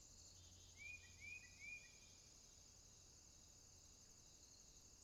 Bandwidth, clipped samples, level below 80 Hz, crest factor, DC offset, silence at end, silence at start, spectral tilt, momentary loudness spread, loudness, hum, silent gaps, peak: 15 kHz; under 0.1%; -76 dBFS; 18 dB; under 0.1%; 0 s; 0 s; -1 dB/octave; 9 LU; -61 LUFS; none; none; -46 dBFS